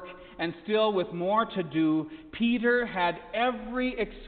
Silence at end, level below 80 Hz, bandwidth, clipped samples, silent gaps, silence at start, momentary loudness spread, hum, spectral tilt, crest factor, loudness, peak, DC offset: 0 s; -54 dBFS; 4.6 kHz; under 0.1%; none; 0 s; 9 LU; none; -9.5 dB/octave; 16 dB; -28 LUFS; -14 dBFS; under 0.1%